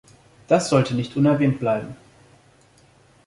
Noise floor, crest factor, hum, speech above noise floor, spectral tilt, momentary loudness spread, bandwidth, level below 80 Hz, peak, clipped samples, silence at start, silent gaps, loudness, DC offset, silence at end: -55 dBFS; 20 dB; none; 35 dB; -6.5 dB/octave; 7 LU; 11.5 kHz; -58 dBFS; -4 dBFS; under 0.1%; 0.5 s; none; -21 LUFS; under 0.1%; 1.3 s